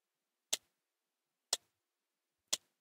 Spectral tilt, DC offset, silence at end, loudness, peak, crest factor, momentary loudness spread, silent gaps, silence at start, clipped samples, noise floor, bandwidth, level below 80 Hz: 2.5 dB/octave; under 0.1%; 0.25 s; -40 LUFS; -14 dBFS; 34 dB; 1 LU; none; 0.5 s; under 0.1%; under -90 dBFS; 16 kHz; under -90 dBFS